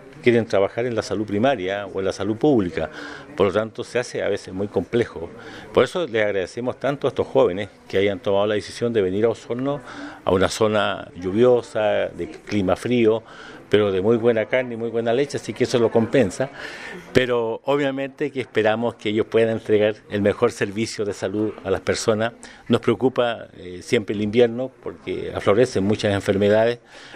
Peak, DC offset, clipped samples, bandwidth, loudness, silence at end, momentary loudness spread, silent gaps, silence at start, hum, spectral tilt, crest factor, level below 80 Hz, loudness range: 0 dBFS; under 0.1%; under 0.1%; 13.5 kHz; -22 LUFS; 0 s; 10 LU; none; 0 s; none; -5.5 dB/octave; 20 dB; -54 dBFS; 3 LU